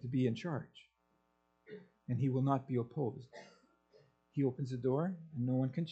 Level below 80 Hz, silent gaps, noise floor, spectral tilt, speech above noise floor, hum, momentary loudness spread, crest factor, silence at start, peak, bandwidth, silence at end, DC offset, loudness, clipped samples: -74 dBFS; none; -78 dBFS; -9 dB/octave; 42 dB; none; 21 LU; 20 dB; 0.05 s; -18 dBFS; 7.8 kHz; 0 s; under 0.1%; -37 LUFS; under 0.1%